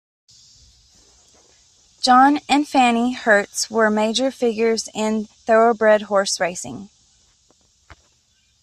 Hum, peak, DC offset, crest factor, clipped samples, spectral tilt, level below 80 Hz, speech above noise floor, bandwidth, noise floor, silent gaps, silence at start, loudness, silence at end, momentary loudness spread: none; -4 dBFS; under 0.1%; 16 dB; under 0.1%; -3 dB/octave; -60 dBFS; 44 dB; 14 kHz; -61 dBFS; none; 2 s; -18 LUFS; 0.7 s; 9 LU